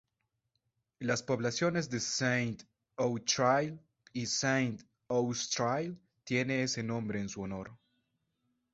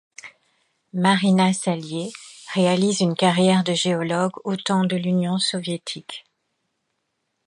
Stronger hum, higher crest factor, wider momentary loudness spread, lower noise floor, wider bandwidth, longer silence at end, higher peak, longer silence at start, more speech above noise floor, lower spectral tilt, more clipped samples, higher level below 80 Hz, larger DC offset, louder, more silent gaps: neither; about the same, 20 dB vs 20 dB; about the same, 14 LU vs 15 LU; first, -84 dBFS vs -75 dBFS; second, 8 kHz vs 11 kHz; second, 1 s vs 1.25 s; second, -14 dBFS vs -2 dBFS; first, 1 s vs 0.25 s; second, 51 dB vs 55 dB; about the same, -4 dB/octave vs -5 dB/octave; neither; about the same, -68 dBFS vs -68 dBFS; neither; second, -33 LUFS vs -21 LUFS; neither